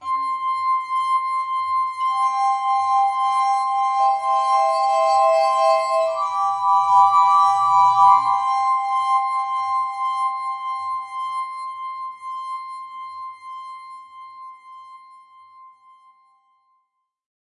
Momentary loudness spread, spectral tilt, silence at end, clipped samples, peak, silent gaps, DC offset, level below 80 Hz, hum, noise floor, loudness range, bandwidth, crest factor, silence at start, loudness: 19 LU; -1 dB/octave; 1.8 s; under 0.1%; -2 dBFS; none; under 0.1%; -72 dBFS; none; -72 dBFS; 17 LU; 11 kHz; 18 dB; 0 s; -19 LUFS